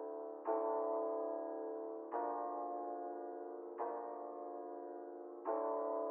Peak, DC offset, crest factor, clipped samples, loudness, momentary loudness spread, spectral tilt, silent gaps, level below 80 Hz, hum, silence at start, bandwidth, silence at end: -26 dBFS; under 0.1%; 16 dB; under 0.1%; -43 LUFS; 10 LU; 3 dB/octave; none; under -90 dBFS; none; 0 s; 2.7 kHz; 0 s